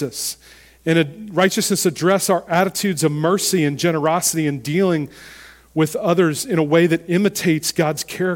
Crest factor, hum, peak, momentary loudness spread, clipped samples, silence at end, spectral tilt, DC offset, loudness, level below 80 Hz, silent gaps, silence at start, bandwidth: 18 dB; none; -2 dBFS; 7 LU; under 0.1%; 0 s; -4.5 dB/octave; under 0.1%; -18 LUFS; -56 dBFS; none; 0 s; 17.5 kHz